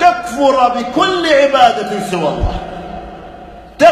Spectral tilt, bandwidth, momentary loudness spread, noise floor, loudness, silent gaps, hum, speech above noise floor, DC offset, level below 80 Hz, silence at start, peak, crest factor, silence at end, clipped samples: -4.5 dB/octave; 14 kHz; 20 LU; -34 dBFS; -13 LUFS; none; none; 21 dB; under 0.1%; -30 dBFS; 0 s; 0 dBFS; 14 dB; 0 s; 0.5%